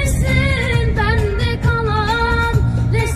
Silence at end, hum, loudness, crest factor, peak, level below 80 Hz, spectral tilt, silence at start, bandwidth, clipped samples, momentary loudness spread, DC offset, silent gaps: 0 s; none; -17 LUFS; 12 dB; -4 dBFS; -22 dBFS; -6 dB/octave; 0 s; 14 kHz; under 0.1%; 2 LU; under 0.1%; none